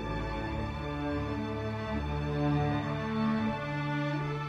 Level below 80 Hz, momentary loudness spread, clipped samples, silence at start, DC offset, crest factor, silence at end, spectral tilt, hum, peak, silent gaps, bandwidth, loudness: -44 dBFS; 5 LU; under 0.1%; 0 s; under 0.1%; 14 dB; 0 s; -7.5 dB/octave; none; -18 dBFS; none; 8 kHz; -33 LUFS